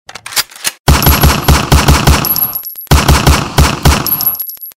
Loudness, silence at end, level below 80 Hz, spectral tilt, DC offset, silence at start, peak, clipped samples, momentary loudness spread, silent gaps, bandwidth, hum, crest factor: -10 LUFS; 0.1 s; -14 dBFS; -4 dB/octave; under 0.1%; 0.25 s; 0 dBFS; 0.2%; 7 LU; 0.79-0.84 s; 16.5 kHz; none; 10 dB